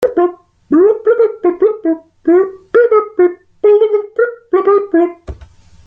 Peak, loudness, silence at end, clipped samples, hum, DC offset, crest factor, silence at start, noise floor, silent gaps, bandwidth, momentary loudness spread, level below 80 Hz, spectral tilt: 0 dBFS; -13 LUFS; 0.4 s; under 0.1%; none; under 0.1%; 12 dB; 0 s; -40 dBFS; none; 4.3 kHz; 8 LU; -44 dBFS; -8 dB/octave